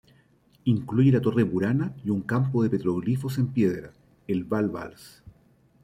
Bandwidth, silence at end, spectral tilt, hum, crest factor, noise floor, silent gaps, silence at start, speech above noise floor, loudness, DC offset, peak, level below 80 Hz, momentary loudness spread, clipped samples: 15 kHz; 0.55 s; -9 dB/octave; none; 18 dB; -61 dBFS; none; 0.65 s; 36 dB; -25 LUFS; under 0.1%; -8 dBFS; -60 dBFS; 10 LU; under 0.1%